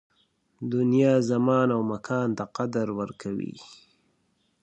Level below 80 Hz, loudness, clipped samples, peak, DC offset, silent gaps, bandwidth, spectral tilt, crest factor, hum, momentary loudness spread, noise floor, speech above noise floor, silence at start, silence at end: -66 dBFS; -25 LUFS; under 0.1%; -8 dBFS; under 0.1%; none; 8.6 kHz; -7.5 dB/octave; 18 dB; none; 12 LU; -71 dBFS; 45 dB; 0.6 s; 0.9 s